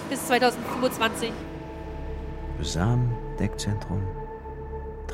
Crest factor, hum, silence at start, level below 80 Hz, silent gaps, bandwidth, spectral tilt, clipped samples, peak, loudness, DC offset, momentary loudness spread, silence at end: 18 dB; none; 0 s; -38 dBFS; none; 16.5 kHz; -5 dB/octave; under 0.1%; -8 dBFS; -28 LUFS; under 0.1%; 14 LU; 0 s